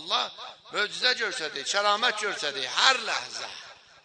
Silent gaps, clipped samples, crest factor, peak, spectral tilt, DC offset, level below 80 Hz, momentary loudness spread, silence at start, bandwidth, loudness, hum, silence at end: none; under 0.1%; 26 dB; -4 dBFS; 0.5 dB/octave; under 0.1%; -78 dBFS; 14 LU; 0 s; 10.5 kHz; -26 LUFS; none; 0.3 s